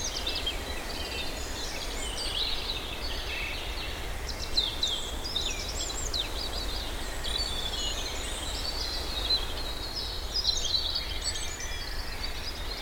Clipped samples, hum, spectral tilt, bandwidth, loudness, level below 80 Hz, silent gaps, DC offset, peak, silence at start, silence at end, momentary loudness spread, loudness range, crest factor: under 0.1%; none; -2 dB/octave; over 20 kHz; -31 LUFS; -38 dBFS; none; under 0.1%; -14 dBFS; 0 s; 0 s; 8 LU; 3 LU; 18 dB